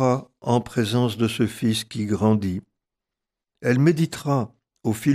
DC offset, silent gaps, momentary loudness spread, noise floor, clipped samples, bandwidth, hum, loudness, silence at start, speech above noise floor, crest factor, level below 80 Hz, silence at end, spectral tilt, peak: under 0.1%; none; 9 LU; -86 dBFS; under 0.1%; 15 kHz; none; -23 LUFS; 0 s; 64 dB; 16 dB; -58 dBFS; 0 s; -6.5 dB/octave; -8 dBFS